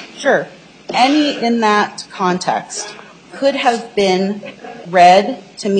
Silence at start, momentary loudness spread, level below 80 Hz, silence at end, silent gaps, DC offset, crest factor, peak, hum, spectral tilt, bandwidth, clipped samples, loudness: 0 s; 16 LU; -60 dBFS; 0 s; none; under 0.1%; 16 dB; 0 dBFS; none; -4 dB/octave; 9.4 kHz; under 0.1%; -15 LUFS